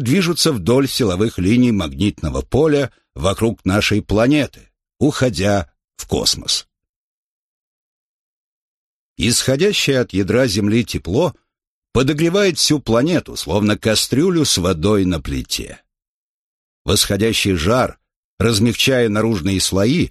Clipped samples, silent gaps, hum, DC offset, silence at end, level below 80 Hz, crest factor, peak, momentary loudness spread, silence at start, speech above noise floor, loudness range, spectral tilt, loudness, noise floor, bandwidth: under 0.1%; 6.89-9.16 s, 11.67-11.82 s, 16.08-16.85 s, 18.16-18.38 s; none; under 0.1%; 0 s; -38 dBFS; 16 dB; -2 dBFS; 7 LU; 0 s; 64 dB; 5 LU; -4.5 dB/octave; -17 LUFS; -80 dBFS; 13 kHz